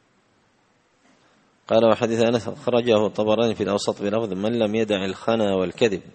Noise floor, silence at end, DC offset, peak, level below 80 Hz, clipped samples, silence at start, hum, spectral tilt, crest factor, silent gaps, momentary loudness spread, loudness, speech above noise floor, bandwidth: -63 dBFS; 0.05 s; under 0.1%; -2 dBFS; -60 dBFS; under 0.1%; 1.7 s; none; -5.5 dB/octave; 20 dB; none; 5 LU; -22 LUFS; 42 dB; 8.8 kHz